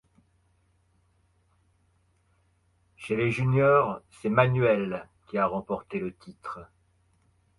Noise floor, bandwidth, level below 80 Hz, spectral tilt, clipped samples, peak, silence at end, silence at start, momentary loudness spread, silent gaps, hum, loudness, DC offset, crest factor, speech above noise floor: -68 dBFS; 11.5 kHz; -60 dBFS; -8 dB/octave; under 0.1%; -6 dBFS; 0.95 s; 3 s; 19 LU; none; none; -26 LUFS; under 0.1%; 24 dB; 42 dB